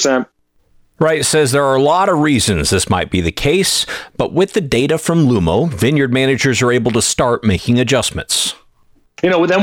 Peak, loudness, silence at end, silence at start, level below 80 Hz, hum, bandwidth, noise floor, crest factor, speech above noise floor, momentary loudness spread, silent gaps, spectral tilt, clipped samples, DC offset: -2 dBFS; -14 LUFS; 0 s; 0 s; -36 dBFS; none; 17.5 kHz; -53 dBFS; 12 dB; 39 dB; 5 LU; none; -4.5 dB/octave; under 0.1%; under 0.1%